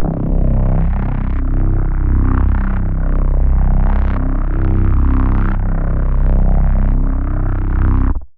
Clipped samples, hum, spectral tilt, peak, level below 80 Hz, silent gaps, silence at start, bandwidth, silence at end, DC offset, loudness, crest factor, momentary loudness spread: under 0.1%; none; -12.5 dB/octave; -2 dBFS; -14 dBFS; none; 0 s; 2.6 kHz; 0.1 s; 1%; -17 LUFS; 10 dB; 4 LU